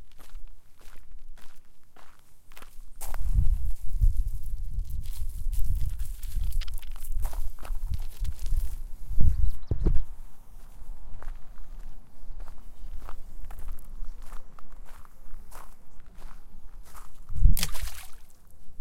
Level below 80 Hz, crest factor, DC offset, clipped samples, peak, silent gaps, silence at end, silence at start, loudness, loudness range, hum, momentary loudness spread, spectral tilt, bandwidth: -30 dBFS; 20 dB; under 0.1%; under 0.1%; -4 dBFS; none; 0 s; 0 s; -34 LUFS; 15 LU; none; 24 LU; -5 dB/octave; 15.5 kHz